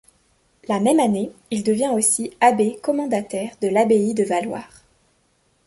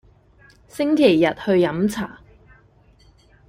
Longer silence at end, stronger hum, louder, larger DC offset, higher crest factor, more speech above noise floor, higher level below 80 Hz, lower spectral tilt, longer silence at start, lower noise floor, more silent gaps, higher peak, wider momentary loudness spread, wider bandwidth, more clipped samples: second, 1 s vs 1.35 s; neither; about the same, -20 LUFS vs -19 LUFS; neither; about the same, 18 dB vs 20 dB; first, 44 dB vs 36 dB; second, -62 dBFS vs -54 dBFS; second, -4.5 dB/octave vs -6 dB/octave; about the same, 0.7 s vs 0.75 s; first, -64 dBFS vs -54 dBFS; neither; about the same, -2 dBFS vs -2 dBFS; second, 9 LU vs 16 LU; second, 12 kHz vs 16 kHz; neither